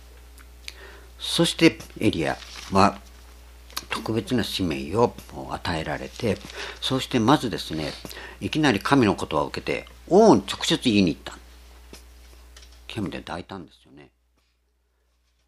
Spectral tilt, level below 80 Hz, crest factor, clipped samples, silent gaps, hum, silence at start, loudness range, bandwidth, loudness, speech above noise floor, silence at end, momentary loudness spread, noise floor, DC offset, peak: -5 dB/octave; -48 dBFS; 24 dB; under 0.1%; none; none; 0.05 s; 16 LU; 15 kHz; -23 LUFS; 45 dB; 1.85 s; 19 LU; -68 dBFS; under 0.1%; 0 dBFS